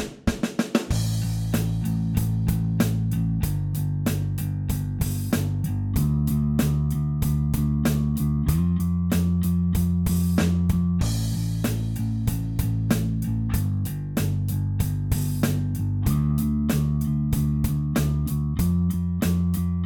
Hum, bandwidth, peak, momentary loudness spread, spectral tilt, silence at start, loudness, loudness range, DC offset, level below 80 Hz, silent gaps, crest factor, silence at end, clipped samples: none; 19 kHz; -6 dBFS; 4 LU; -7 dB/octave; 0 s; -24 LUFS; 3 LU; under 0.1%; -32 dBFS; none; 16 dB; 0 s; under 0.1%